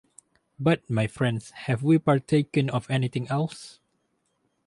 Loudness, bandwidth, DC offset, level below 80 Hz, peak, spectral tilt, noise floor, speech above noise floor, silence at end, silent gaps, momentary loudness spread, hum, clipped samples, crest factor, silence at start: -25 LUFS; 11.5 kHz; under 0.1%; -60 dBFS; -8 dBFS; -7 dB/octave; -73 dBFS; 48 dB; 1 s; none; 10 LU; none; under 0.1%; 18 dB; 0.6 s